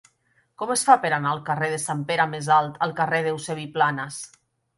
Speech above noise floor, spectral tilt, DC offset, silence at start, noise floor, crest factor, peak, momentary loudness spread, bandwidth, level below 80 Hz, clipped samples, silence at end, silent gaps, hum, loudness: 43 dB; -4 dB/octave; under 0.1%; 0.6 s; -66 dBFS; 22 dB; -2 dBFS; 13 LU; 11.5 kHz; -68 dBFS; under 0.1%; 0.5 s; none; none; -23 LUFS